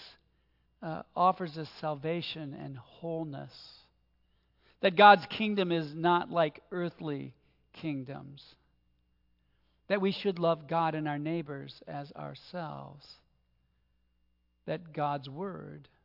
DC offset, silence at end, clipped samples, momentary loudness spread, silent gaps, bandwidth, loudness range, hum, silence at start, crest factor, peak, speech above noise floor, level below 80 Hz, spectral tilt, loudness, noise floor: under 0.1%; 0.25 s; under 0.1%; 17 LU; none; 5.8 kHz; 15 LU; none; 0 s; 26 dB; -6 dBFS; 42 dB; -74 dBFS; -7.5 dB/octave; -30 LUFS; -73 dBFS